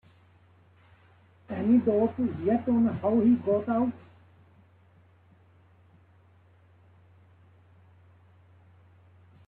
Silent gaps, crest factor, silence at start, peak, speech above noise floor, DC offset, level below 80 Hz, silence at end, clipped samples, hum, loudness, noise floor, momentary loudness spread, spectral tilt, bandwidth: none; 18 dB; 1.5 s; -14 dBFS; 35 dB; under 0.1%; -66 dBFS; 5.5 s; under 0.1%; none; -26 LUFS; -59 dBFS; 9 LU; -11.5 dB/octave; 3.7 kHz